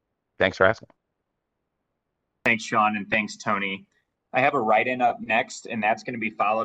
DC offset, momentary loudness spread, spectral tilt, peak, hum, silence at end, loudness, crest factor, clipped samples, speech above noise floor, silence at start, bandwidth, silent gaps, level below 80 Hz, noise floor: under 0.1%; 9 LU; -4.5 dB/octave; -2 dBFS; none; 0 s; -24 LUFS; 22 dB; under 0.1%; 56 dB; 0.4 s; 9.2 kHz; none; -64 dBFS; -80 dBFS